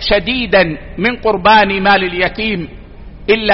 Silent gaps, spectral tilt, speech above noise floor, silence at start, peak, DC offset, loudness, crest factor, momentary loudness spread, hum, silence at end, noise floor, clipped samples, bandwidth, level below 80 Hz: none; -2 dB/octave; 20 dB; 0 s; 0 dBFS; under 0.1%; -13 LUFS; 14 dB; 10 LU; none; 0 s; -32 dBFS; under 0.1%; 6 kHz; -32 dBFS